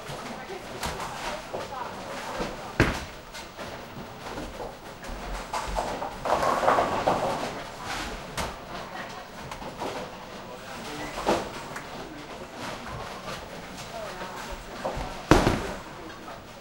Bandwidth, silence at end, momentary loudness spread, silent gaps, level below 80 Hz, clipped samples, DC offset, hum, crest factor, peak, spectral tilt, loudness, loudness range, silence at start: 16 kHz; 0 s; 15 LU; none; -42 dBFS; under 0.1%; under 0.1%; none; 30 dB; 0 dBFS; -4.5 dB/octave; -31 LUFS; 8 LU; 0 s